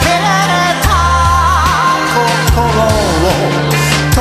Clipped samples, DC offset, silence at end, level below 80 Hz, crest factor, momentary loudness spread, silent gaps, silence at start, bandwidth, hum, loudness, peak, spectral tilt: under 0.1%; under 0.1%; 0 s; -20 dBFS; 10 dB; 2 LU; none; 0 s; 15.5 kHz; none; -11 LUFS; 0 dBFS; -4.5 dB/octave